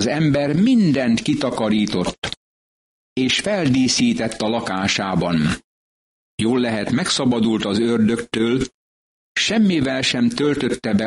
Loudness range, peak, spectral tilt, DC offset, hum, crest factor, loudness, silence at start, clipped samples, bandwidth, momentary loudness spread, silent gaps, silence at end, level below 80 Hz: 1 LU; -6 dBFS; -4.5 dB/octave; under 0.1%; none; 14 dB; -19 LUFS; 0 s; under 0.1%; 11.5 kHz; 7 LU; 2.18-2.22 s, 2.37-3.16 s, 5.64-6.38 s, 8.74-9.35 s; 0 s; -48 dBFS